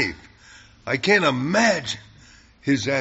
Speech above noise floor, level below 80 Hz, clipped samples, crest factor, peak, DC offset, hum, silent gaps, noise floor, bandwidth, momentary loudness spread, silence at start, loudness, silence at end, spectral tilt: 30 dB; -54 dBFS; under 0.1%; 20 dB; -4 dBFS; under 0.1%; none; none; -50 dBFS; 8 kHz; 15 LU; 0 s; -21 LUFS; 0 s; -3 dB/octave